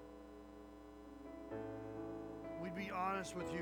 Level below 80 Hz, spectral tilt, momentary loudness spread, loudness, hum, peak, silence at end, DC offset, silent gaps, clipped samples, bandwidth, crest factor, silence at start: -66 dBFS; -5.5 dB/octave; 16 LU; -46 LUFS; none; -28 dBFS; 0 s; under 0.1%; none; under 0.1%; over 20 kHz; 20 dB; 0 s